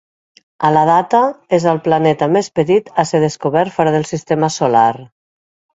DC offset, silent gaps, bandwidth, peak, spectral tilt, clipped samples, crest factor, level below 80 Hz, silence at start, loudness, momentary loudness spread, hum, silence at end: under 0.1%; none; 8 kHz; 0 dBFS; -6 dB/octave; under 0.1%; 14 dB; -56 dBFS; 0.6 s; -14 LUFS; 5 LU; none; 0.7 s